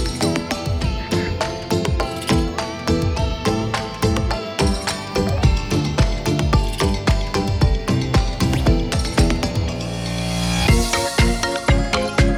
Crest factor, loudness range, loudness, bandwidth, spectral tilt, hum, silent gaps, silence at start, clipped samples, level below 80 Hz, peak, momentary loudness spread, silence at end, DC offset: 14 dB; 2 LU; -20 LUFS; 16.5 kHz; -5 dB/octave; none; none; 0 s; under 0.1%; -24 dBFS; -4 dBFS; 5 LU; 0 s; under 0.1%